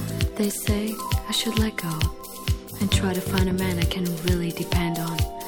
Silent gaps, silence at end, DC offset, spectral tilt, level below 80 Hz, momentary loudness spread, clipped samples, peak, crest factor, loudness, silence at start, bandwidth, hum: none; 0 s; under 0.1%; -5 dB/octave; -32 dBFS; 5 LU; under 0.1%; -6 dBFS; 18 dB; -25 LUFS; 0 s; over 20 kHz; none